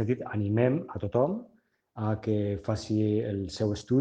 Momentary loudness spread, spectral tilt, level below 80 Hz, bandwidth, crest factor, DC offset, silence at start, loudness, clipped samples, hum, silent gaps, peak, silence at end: 7 LU; -8 dB/octave; -60 dBFS; 9 kHz; 18 dB; under 0.1%; 0 s; -29 LUFS; under 0.1%; none; none; -12 dBFS; 0 s